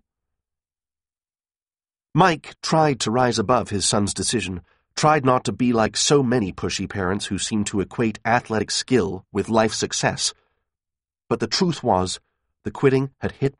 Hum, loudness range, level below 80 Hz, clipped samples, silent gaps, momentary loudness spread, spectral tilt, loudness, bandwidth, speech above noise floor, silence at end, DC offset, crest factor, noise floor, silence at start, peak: none; 3 LU; -52 dBFS; under 0.1%; none; 8 LU; -4 dB/octave; -21 LUFS; 11 kHz; over 69 dB; 0.1 s; under 0.1%; 20 dB; under -90 dBFS; 2.15 s; -2 dBFS